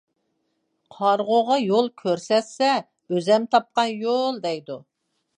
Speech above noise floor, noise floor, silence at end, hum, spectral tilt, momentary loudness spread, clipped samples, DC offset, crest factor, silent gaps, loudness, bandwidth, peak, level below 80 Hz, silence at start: 52 dB; -73 dBFS; 0.6 s; none; -5 dB/octave; 9 LU; under 0.1%; under 0.1%; 20 dB; none; -22 LUFS; 10 kHz; -4 dBFS; -78 dBFS; 1 s